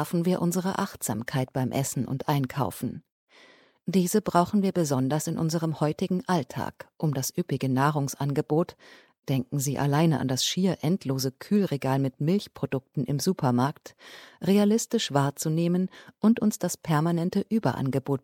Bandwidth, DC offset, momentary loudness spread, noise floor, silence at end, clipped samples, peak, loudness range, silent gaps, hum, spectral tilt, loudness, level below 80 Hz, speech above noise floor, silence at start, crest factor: 17.5 kHz; under 0.1%; 8 LU; -57 dBFS; 0.05 s; under 0.1%; -6 dBFS; 3 LU; 3.12-3.27 s; none; -5.5 dB/octave; -27 LUFS; -64 dBFS; 31 dB; 0 s; 20 dB